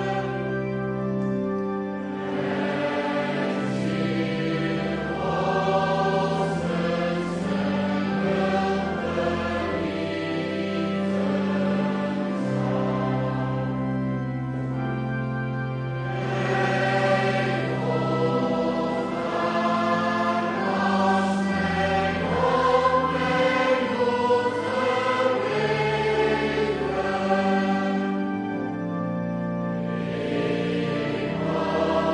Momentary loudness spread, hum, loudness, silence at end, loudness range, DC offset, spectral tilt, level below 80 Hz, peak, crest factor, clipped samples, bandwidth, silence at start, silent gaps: 6 LU; none; -25 LUFS; 0 s; 5 LU; under 0.1%; -7 dB/octave; -52 dBFS; -8 dBFS; 16 dB; under 0.1%; 10.5 kHz; 0 s; none